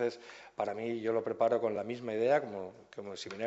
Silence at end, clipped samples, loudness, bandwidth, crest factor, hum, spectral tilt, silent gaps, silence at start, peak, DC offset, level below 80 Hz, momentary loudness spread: 0 s; under 0.1%; -34 LUFS; 8.2 kHz; 18 dB; none; -5.5 dB/octave; none; 0 s; -16 dBFS; under 0.1%; -76 dBFS; 16 LU